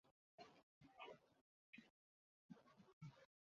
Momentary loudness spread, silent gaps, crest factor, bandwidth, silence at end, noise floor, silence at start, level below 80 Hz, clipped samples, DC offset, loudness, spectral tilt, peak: 6 LU; 0.11-0.38 s, 0.63-0.81 s, 1.41-1.73 s, 1.90-2.49 s, 2.93-3.01 s; 20 dB; 7 kHz; 0.15 s; under -90 dBFS; 0.05 s; under -90 dBFS; under 0.1%; under 0.1%; -65 LUFS; -4.5 dB/octave; -46 dBFS